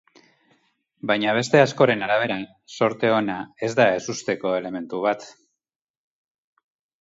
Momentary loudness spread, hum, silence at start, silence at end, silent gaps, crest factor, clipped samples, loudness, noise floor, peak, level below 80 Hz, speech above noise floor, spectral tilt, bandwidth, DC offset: 11 LU; none; 1.05 s; 1.7 s; none; 22 dB; under 0.1%; -22 LUFS; -65 dBFS; -2 dBFS; -66 dBFS; 44 dB; -5 dB/octave; 8 kHz; under 0.1%